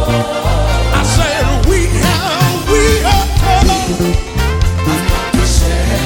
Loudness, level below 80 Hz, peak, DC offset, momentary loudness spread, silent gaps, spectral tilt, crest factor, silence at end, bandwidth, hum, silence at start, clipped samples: -13 LUFS; -16 dBFS; 0 dBFS; under 0.1%; 4 LU; none; -4.5 dB/octave; 12 dB; 0 s; 17.5 kHz; none; 0 s; under 0.1%